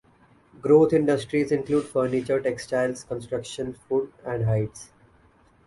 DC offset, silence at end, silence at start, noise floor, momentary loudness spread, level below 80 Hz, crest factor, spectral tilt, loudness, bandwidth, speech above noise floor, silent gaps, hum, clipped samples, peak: under 0.1%; 0.8 s; 0.65 s; -58 dBFS; 14 LU; -54 dBFS; 18 dB; -7 dB/octave; -25 LUFS; 11.5 kHz; 35 dB; none; none; under 0.1%; -6 dBFS